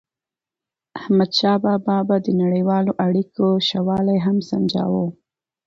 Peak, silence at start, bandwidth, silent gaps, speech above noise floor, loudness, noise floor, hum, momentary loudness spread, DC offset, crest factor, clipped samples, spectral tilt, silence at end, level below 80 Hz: -6 dBFS; 0.95 s; 7.2 kHz; none; 71 dB; -19 LUFS; -89 dBFS; none; 5 LU; under 0.1%; 14 dB; under 0.1%; -7.5 dB/octave; 0.55 s; -60 dBFS